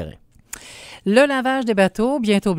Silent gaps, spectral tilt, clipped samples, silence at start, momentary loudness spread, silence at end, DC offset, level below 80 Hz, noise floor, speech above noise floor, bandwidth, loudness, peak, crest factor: none; -5.5 dB/octave; under 0.1%; 0 s; 20 LU; 0 s; under 0.1%; -48 dBFS; -40 dBFS; 23 dB; 16 kHz; -18 LUFS; -2 dBFS; 18 dB